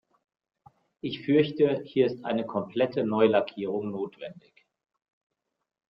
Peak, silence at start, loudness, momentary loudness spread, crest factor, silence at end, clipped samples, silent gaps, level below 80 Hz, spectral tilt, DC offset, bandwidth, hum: -8 dBFS; 1.05 s; -27 LUFS; 14 LU; 20 dB; 1.5 s; under 0.1%; none; -72 dBFS; -9.5 dB/octave; under 0.1%; 5.8 kHz; none